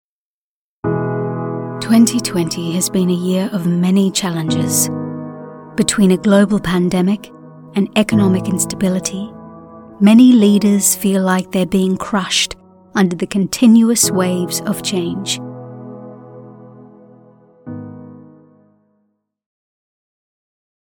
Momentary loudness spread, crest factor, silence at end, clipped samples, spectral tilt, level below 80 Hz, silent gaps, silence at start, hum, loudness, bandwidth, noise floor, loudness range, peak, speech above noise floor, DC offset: 20 LU; 16 dB; 2.65 s; under 0.1%; -4.5 dB/octave; -50 dBFS; none; 0.85 s; none; -15 LUFS; 19 kHz; under -90 dBFS; 9 LU; 0 dBFS; over 76 dB; under 0.1%